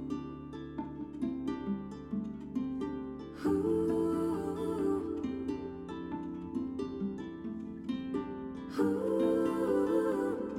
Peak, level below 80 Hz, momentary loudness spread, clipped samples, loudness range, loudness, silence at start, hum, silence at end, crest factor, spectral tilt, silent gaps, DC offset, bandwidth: -18 dBFS; -60 dBFS; 11 LU; under 0.1%; 6 LU; -35 LUFS; 0 s; none; 0 s; 16 dB; -8 dB/octave; none; under 0.1%; 14 kHz